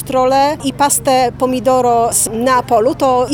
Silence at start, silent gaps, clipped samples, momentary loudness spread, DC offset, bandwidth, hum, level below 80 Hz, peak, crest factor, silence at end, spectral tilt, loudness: 0 s; none; under 0.1%; 3 LU; under 0.1%; 19 kHz; none; -42 dBFS; 0 dBFS; 12 dB; 0 s; -3.5 dB/octave; -13 LUFS